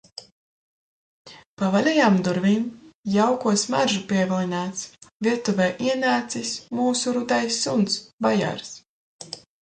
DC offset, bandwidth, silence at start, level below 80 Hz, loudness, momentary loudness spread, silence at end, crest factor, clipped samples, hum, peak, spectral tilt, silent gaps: under 0.1%; 9.4 kHz; 0.2 s; -64 dBFS; -23 LUFS; 18 LU; 0.25 s; 18 dB; under 0.1%; none; -6 dBFS; -4.5 dB/octave; 0.32-1.25 s, 1.46-1.57 s, 2.94-3.03 s, 5.12-5.20 s, 8.13-8.18 s, 8.89-9.19 s